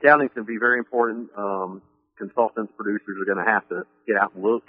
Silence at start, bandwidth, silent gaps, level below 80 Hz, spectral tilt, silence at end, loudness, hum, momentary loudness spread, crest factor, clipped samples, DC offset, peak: 0 s; 5.2 kHz; none; -74 dBFS; -4.5 dB/octave; 0.1 s; -23 LUFS; none; 11 LU; 22 dB; under 0.1%; under 0.1%; -2 dBFS